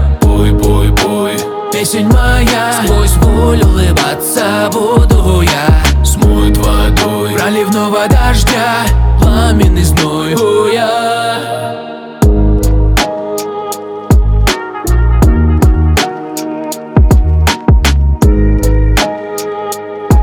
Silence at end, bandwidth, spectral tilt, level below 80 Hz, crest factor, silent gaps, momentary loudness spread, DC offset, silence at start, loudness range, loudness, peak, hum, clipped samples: 0 s; 19 kHz; -5.5 dB/octave; -12 dBFS; 8 dB; none; 9 LU; under 0.1%; 0 s; 2 LU; -11 LUFS; 0 dBFS; none; under 0.1%